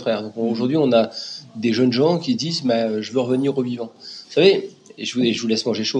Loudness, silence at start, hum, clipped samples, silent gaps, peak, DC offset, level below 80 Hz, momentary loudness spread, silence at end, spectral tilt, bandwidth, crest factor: -20 LUFS; 0 s; none; under 0.1%; none; -2 dBFS; under 0.1%; -76 dBFS; 13 LU; 0 s; -5.5 dB/octave; 9.8 kHz; 18 dB